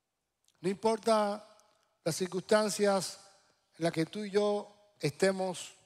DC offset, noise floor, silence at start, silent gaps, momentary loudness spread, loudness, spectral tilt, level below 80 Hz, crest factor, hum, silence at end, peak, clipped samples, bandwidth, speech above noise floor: under 0.1%; -77 dBFS; 0.6 s; none; 10 LU; -32 LUFS; -4.5 dB/octave; -76 dBFS; 18 dB; none; 0.15 s; -16 dBFS; under 0.1%; 15.5 kHz; 46 dB